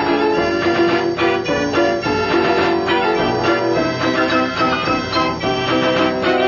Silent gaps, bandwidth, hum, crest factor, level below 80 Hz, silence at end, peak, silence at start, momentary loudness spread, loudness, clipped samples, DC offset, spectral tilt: none; 7.4 kHz; none; 12 dB; -44 dBFS; 0 s; -4 dBFS; 0 s; 2 LU; -16 LUFS; under 0.1%; under 0.1%; -5.5 dB/octave